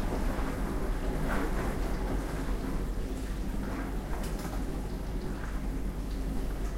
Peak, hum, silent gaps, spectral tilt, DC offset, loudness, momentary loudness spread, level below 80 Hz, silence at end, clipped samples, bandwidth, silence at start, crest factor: -18 dBFS; none; none; -6 dB/octave; under 0.1%; -36 LUFS; 4 LU; -34 dBFS; 0 s; under 0.1%; 16 kHz; 0 s; 14 dB